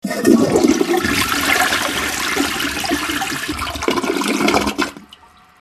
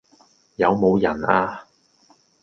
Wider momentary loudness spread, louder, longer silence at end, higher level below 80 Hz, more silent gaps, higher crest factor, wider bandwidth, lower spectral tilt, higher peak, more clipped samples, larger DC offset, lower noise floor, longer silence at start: second, 7 LU vs 18 LU; first, -17 LUFS vs -20 LUFS; second, 0.55 s vs 0.8 s; first, -40 dBFS vs -52 dBFS; neither; about the same, 18 dB vs 22 dB; first, 14 kHz vs 6.8 kHz; second, -3 dB/octave vs -8 dB/octave; about the same, 0 dBFS vs 0 dBFS; neither; neither; second, -45 dBFS vs -58 dBFS; second, 0.05 s vs 0.6 s